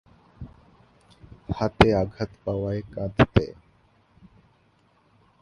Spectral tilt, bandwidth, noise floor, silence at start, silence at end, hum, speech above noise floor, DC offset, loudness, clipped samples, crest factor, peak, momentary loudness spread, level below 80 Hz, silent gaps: -7.5 dB/octave; 11.5 kHz; -63 dBFS; 0.4 s; 1.9 s; none; 40 dB; under 0.1%; -24 LUFS; under 0.1%; 26 dB; 0 dBFS; 25 LU; -40 dBFS; none